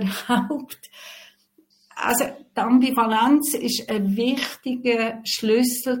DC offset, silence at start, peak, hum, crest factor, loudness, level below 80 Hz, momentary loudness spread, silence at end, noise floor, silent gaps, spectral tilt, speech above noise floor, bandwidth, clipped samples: under 0.1%; 0 s; -6 dBFS; none; 16 dB; -22 LUFS; -64 dBFS; 20 LU; 0 s; -61 dBFS; none; -4 dB/octave; 39 dB; 17 kHz; under 0.1%